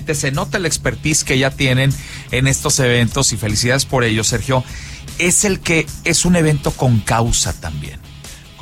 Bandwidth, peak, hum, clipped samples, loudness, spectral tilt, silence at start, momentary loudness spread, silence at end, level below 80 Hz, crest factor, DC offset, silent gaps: 16.5 kHz; -2 dBFS; none; under 0.1%; -15 LUFS; -4 dB/octave; 0 s; 15 LU; 0 s; -32 dBFS; 14 dB; under 0.1%; none